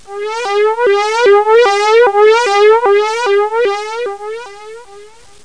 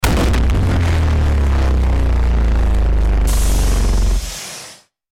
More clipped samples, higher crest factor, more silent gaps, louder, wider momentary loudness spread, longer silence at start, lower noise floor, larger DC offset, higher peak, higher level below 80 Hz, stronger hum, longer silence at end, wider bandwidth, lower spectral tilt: neither; about the same, 12 dB vs 10 dB; neither; first, -11 LUFS vs -17 LUFS; first, 13 LU vs 8 LU; about the same, 0.1 s vs 0 s; about the same, -39 dBFS vs -39 dBFS; first, 0.9% vs under 0.1%; first, 0 dBFS vs -4 dBFS; second, -58 dBFS vs -16 dBFS; neither; about the same, 0.4 s vs 0.4 s; second, 10.5 kHz vs 16.5 kHz; second, -1.5 dB/octave vs -5.5 dB/octave